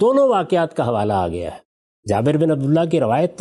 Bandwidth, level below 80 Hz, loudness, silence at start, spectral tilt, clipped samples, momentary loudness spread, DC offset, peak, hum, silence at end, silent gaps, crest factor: 11.5 kHz; -54 dBFS; -18 LUFS; 0 s; -7.5 dB/octave; under 0.1%; 9 LU; under 0.1%; -6 dBFS; none; 0.05 s; 1.65-2.03 s; 12 dB